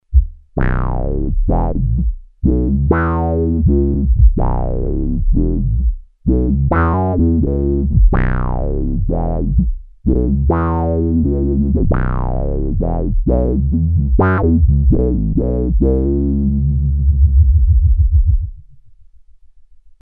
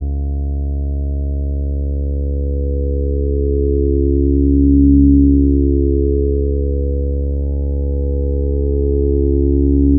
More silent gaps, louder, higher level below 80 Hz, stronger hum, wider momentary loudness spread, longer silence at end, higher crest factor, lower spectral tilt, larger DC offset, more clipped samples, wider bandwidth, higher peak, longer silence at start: neither; about the same, -16 LUFS vs -16 LUFS; about the same, -16 dBFS vs -16 dBFS; neither; second, 7 LU vs 10 LU; first, 0.4 s vs 0 s; about the same, 14 dB vs 14 dB; about the same, -13.5 dB/octave vs -14.5 dB/octave; neither; neither; first, 2.8 kHz vs 0.9 kHz; about the same, 0 dBFS vs 0 dBFS; about the same, 0.1 s vs 0 s